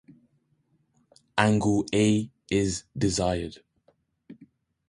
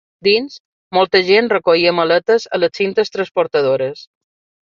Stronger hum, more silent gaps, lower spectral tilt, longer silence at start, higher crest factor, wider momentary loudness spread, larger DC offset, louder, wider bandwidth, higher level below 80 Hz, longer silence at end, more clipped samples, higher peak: neither; second, none vs 0.60-0.91 s; about the same, -5 dB/octave vs -5 dB/octave; first, 1.35 s vs 0.25 s; first, 24 dB vs 16 dB; about the same, 8 LU vs 7 LU; neither; second, -26 LUFS vs -15 LUFS; first, 11.5 kHz vs 7.4 kHz; first, -50 dBFS vs -62 dBFS; about the same, 0.55 s vs 0.65 s; neither; second, -4 dBFS vs 0 dBFS